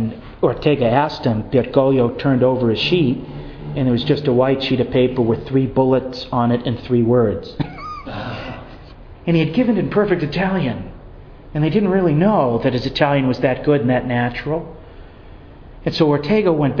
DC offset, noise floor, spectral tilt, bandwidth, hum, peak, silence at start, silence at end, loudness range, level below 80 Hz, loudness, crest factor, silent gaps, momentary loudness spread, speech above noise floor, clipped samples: under 0.1%; -39 dBFS; -8.5 dB/octave; 5.4 kHz; none; 0 dBFS; 0 s; 0 s; 3 LU; -40 dBFS; -18 LUFS; 18 dB; none; 13 LU; 23 dB; under 0.1%